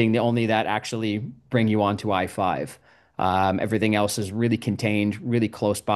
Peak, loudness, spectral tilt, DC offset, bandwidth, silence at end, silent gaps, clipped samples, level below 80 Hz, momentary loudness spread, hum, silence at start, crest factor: -6 dBFS; -24 LUFS; -6 dB/octave; under 0.1%; 12.5 kHz; 0 s; none; under 0.1%; -60 dBFS; 6 LU; none; 0 s; 16 dB